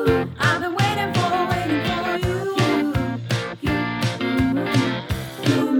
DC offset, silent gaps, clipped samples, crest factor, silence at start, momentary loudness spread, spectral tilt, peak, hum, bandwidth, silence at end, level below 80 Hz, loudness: under 0.1%; none; under 0.1%; 16 dB; 0 s; 4 LU; -6 dB/octave; -4 dBFS; none; 18.5 kHz; 0 s; -40 dBFS; -22 LUFS